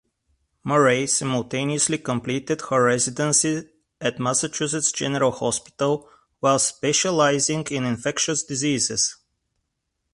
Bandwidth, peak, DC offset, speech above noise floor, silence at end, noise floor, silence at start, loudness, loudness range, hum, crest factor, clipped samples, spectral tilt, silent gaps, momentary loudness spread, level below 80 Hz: 11.5 kHz; -4 dBFS; under 0.1%; 55 dB; 1 s; -77 dBFS; 0.65 s; -22 LUFS; 2 LU; none; 18 dB; under 0.1%; -3 dB/octave; none; 7 LU; -60 dBFS